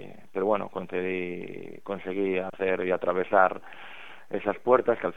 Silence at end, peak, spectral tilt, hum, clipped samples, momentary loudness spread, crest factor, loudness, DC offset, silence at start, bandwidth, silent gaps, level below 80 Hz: 0.05 s; -6 dBFS; -7.5 dB/octave; none; under 0.1%; 17 LU; 22 dB; -27 LUFS; 0.6%; 0 s; 6.6 kHz; none; -68 dBFS